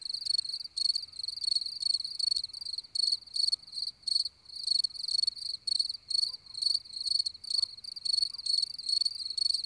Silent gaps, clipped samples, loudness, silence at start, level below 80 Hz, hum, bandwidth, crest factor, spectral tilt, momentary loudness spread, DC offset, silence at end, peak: none; under 0.1%; -30 LUFS; 0 s; -72 dBFS; none; 11 kHz; 16 dB; 2.5 dB/octave; 6 LU; under 0.1%; 0 s; -18 dBFS